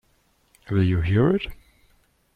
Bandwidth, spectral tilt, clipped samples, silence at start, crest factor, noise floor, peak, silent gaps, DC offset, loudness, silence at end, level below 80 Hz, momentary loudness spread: 4.9 kHz; -9 dB/octave; under 0.1%; 0.7 s; 16 dB; -64 dBFS; -10 dBFS; none; under 0.1%; -22 LUFS; 0.8 s; -44 dBFS; 7 LU